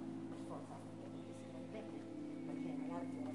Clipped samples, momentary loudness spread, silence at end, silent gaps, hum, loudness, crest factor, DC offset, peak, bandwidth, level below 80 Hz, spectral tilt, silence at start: under 0.1%; 6 LU; 0 s; none; none; -48 LUFS; 14 dB; under 0.1%; -34 dBFS; 11.5 kHz; -84 dBFS; -7 dB/octave; 0 s